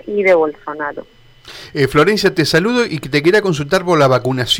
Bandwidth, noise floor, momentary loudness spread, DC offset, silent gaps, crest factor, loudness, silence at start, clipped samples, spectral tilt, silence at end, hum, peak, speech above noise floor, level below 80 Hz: 18 kHz; -37 dBFS; 12 LU; under 0.1%; none; 12 dB; -14 LUFS; 0.05 s; under 0.1%; -5 dB/octave; 0 s; none; -4 dBFS; 23 dB; -44 dBFS